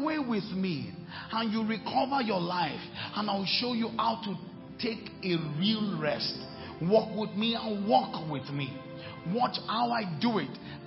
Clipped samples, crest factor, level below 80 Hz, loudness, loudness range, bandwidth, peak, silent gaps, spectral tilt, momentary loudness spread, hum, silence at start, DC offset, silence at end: under 0.1%; 20 dB; -64 dBFS; -31 LUFS; 2 LU; 5.8 kHz; -12 dBFS; none; -9 dB/octave; 11 LU; none; 0 s; under 0.1%; 0 s